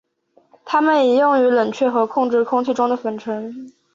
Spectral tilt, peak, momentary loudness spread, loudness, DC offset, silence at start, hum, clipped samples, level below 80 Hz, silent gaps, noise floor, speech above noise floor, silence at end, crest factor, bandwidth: -5.5 dB/octave; -4 dBFS; 12 LU; -18 LUFS; under 0.1%; 0.65 s; none; under 0.1%; -68 dBFS; none; -58 dBFS; 41 dB; 0.25 s; 14 dB; 7.4 kHz